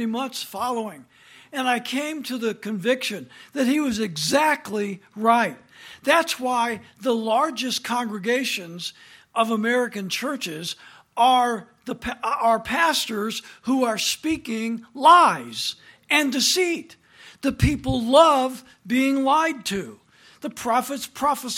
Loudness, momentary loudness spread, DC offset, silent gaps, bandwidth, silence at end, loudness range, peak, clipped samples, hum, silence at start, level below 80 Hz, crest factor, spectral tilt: -22 LUFS; 13 LU; under 0.1%; none; 17 kHz; 0 s; 5 LU; -2 dBFS; under 0.1%; none; 0 s; -46 dBFS; 20 dB; -3.5 dB/octave